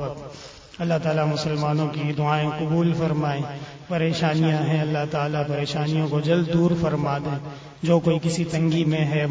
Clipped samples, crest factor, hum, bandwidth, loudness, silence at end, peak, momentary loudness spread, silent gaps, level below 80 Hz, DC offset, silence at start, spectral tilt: under 0.1%; 16 dB; none; 8 kHz; -23 LUFS; 0 s; -6 dBFS; 10 LU; none; -52 dBFS; under 0.1%; 0 s; -7 dB/octave